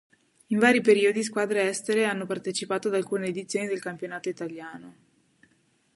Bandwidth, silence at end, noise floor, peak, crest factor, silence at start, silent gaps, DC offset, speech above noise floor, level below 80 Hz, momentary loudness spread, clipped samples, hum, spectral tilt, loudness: 11.5 kHz; 1.05 s; -67 dBFS; -6 dBFS; 20 dB; 0.5 s; none; under 0.1%; 41 dB; -76 dBFS; 15 LU; under 0.1%; none; -4 dB/octave; -26 LUFS